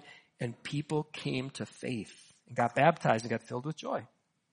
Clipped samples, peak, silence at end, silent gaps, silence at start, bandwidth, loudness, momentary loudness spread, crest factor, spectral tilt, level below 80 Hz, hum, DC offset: under 0.1%; -10 dBFS; 0.45 s; none; 0.05 s; 10 kHz; -33 LUFS; 14 LU; 24 dB; -6 dB/octave; -72 dBFS; none; under 0.1%